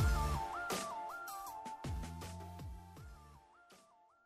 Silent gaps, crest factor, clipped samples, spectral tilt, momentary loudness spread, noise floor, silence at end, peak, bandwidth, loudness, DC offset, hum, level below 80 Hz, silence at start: none; 16 dB; under 0.1%; -5 dB/octave; 24 LU; -67 dBFS; 0.45 s; -26 dBFS; 15.5 kHz; -43 LUFS; under 0.1%; none; -46 dBFS; 0 s